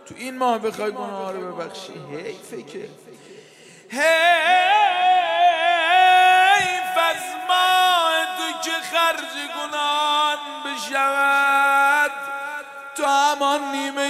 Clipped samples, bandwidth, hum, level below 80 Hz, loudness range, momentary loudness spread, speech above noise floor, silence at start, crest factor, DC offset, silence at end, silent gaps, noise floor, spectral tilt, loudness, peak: under 0.1%; 16 kHz; none; -74 dBFS; 12 LU; 18 LU; 25 dB; 0.05 s; 16 dB; under 0.1%; 0 s; none; -47 dBFS; -1 dB/octave; -18 LUFS; -4 dBFS